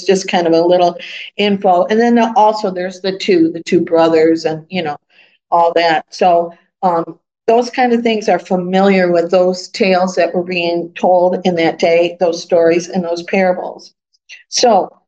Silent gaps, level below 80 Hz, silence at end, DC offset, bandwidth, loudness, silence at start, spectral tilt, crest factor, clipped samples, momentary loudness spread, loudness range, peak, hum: none; -66 dBFS; 0.2 s; under 0.1%; 8.8 kHz; -13 LUFS; 0 s; -5 dB/octave; 14 dB; under 0.1%; 9 LU; 2 LU; 0 dBFS; none